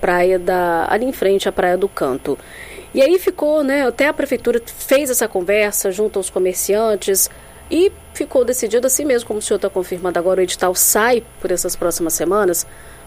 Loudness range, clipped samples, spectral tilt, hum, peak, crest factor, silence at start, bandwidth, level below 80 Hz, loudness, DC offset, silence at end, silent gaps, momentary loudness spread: 1 LU; under 0.1%; -3 dB/octave; none; 0 dBFS; 16 dB; 0 s; 15.5 kHz; -42 dBFS; -17 LUFS; under 0.1%; 0 s; none; 7 LU